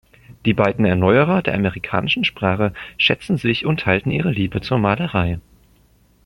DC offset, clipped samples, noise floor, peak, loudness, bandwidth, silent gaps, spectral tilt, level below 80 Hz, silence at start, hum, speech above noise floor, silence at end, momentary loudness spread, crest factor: under 0.1%; under 0.1%; -55 dBFS; -2 dBFS; -19 LUFS; 15.5 kHz; none; -7.5 dB/octave; -44 dBFS; 0.3 s; none; 37 dB; 0.85 s; 7 LU; 16 dB